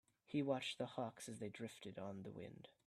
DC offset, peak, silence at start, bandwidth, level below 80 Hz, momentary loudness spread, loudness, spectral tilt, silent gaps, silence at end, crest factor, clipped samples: under 0.1%; -28 dBFS; 0.3 s; 14 kHz; -84 dBFS; 11 LU; -47 LUFS; -5 dB/octave; none; 0.15 s; 20 dB; under 0.1%